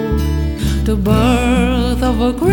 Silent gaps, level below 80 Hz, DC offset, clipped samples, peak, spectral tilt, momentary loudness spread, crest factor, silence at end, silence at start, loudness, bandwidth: none; -20 dBFS; under 0.1%; under 0.1%; -2 dBFS; -6.5 dB/octave; 5 LU; 12 dB; 0 s; 0 s; -15 LUFS; 18.5 kHz